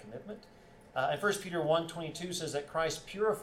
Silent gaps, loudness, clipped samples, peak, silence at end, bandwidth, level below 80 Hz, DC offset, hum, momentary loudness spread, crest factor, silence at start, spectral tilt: none; -34 LUFS; under 0.1%; -16 dBFS; 0 s; 16.5 kHz; -62 dBFS; under 0.1%; none; 15 LU; 18 dB; 0 s; -4 dB/octave